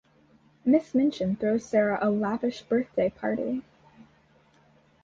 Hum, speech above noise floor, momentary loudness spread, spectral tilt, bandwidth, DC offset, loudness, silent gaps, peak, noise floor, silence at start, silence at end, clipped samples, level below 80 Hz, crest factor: none; 36 dB; 7 LU; -7 dB/octave; 7.6 kHz; under 0.1%; -27 LUFS; none; -10 dBFS; -61 dBFS; 0.65 s; 1.4 s; under 0.1%; -64 dBFS; 16 dB